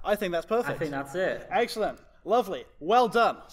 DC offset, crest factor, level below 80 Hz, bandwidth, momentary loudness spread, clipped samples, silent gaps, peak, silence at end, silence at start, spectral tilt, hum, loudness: under 0.1%; 18 dB; -54 dBFS; 16 kHz; 9 LU; under 0.1%; none; -8 dBFS; 0.05 s; 0 s; -5 dB/octave; none; -27 LUFS